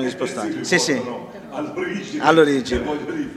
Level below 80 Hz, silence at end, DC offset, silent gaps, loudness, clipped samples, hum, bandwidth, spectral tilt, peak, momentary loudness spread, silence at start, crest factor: -46 dBFS; 0 s; under 0.1%; none; -20 LUFS; under 0.1%; none; 13.5 kHz; -4 dB/octave; 0 dBFS; 15 LU; 0 s; 20 dB